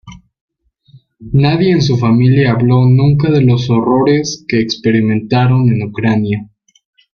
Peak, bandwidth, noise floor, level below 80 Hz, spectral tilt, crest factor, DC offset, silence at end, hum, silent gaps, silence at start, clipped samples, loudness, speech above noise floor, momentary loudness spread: -2 dBFS; 6.8 kHz; -46 dBFS; -42 dBFS; -7 dB/octave; 10 dB; under 0.1%; 0.75 s; none; 0.41-0.48 s; 0.05 s; under 0.1%; -12 LUFS; 35 dB; 6 LU